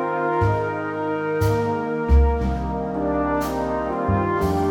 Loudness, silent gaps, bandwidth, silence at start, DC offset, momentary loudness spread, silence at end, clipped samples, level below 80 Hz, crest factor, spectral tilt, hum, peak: -22 LUFS; none; 17.5 kHz; 0 s; under 0.1%; 6 LU; 0 s; under 0.1%; -26 dBFS; 14 dB; -8 dB/octave; none; -6 dBFS